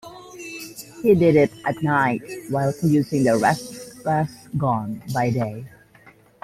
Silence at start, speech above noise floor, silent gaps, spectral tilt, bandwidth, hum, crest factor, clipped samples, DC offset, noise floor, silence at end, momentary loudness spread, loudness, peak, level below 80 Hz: 0.05 s; 31 dB; none; -7 dB/octave; 16 kHz; none; 18 dB; under 0.1%; under 0.1%; -51 dBFS; 0.75 s; 18 LU; -21 LUFS; -4 dBFS; -54 dBFS